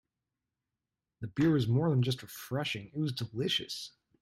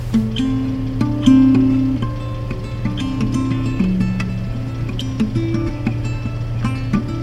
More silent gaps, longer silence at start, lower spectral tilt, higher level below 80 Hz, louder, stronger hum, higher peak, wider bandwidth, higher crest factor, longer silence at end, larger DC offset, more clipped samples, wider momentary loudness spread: neither; first, 1.2 s vs 0 s; second, -6 dB/octave vs -7.5 dB/octave; second, -66 dBFS vs -30 dBFS; second, -32 LUFS vs -19 LUFS; neither; second, -16 dBFS vs 0 dBFS; first, 15.5 kHz vs 10 kHz; about the same, 16 dB vs 18 dB; first, 0.35 s vs 0 s; neither; neither; about the same, 12 LU vs 11 LU